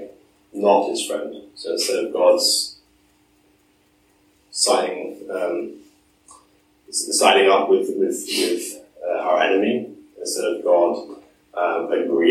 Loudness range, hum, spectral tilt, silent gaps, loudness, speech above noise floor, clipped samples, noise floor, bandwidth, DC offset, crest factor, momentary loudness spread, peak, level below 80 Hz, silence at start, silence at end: 7 LU; none; -2 dB/octave; none; -20 LUFS; 41 dB; under 0.1%; -60 dBFS; 15 kHz; under 0.1%; 22 dB; 16 LU; 0 dBFS; -70 dBFS; 0 s; 0 s